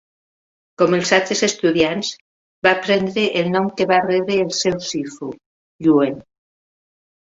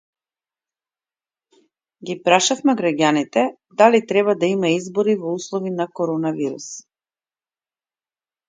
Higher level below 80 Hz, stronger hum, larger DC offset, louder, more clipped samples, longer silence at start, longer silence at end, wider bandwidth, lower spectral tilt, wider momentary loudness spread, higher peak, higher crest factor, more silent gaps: first, -58 dBFS vs -70 dBFS; neither; neither; about the same, -18 LUFS vs -19 LUFS; neither; second, 0.8 s vs 2 s; second, 1.1 s vs 1.7 s; second, 8 kHz vs 9.6 kHz; about the same, -4 dB/octave vs -4 dB/octave; about the same, 10 LU vs 11 LU; about the same, 0 dBFS vs 0 dBFS; about the same, 20 dB vs 22 dB; first, 2.21-2.62 s, 5.46-5.79 s vs none